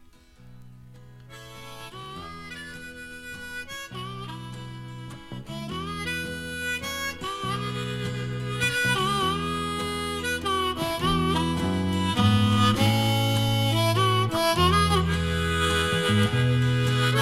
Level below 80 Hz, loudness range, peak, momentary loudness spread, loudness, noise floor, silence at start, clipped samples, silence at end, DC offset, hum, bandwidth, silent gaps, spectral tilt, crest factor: -44 dBFS; 15 LU; -8 dBFS; 18 LU; -25 LUFS; -51 dBFS; 0.4 s; under 0.1%; 0 s; under 0.1%; none; 16 kHz; none; -5 dB/octave; 18 dB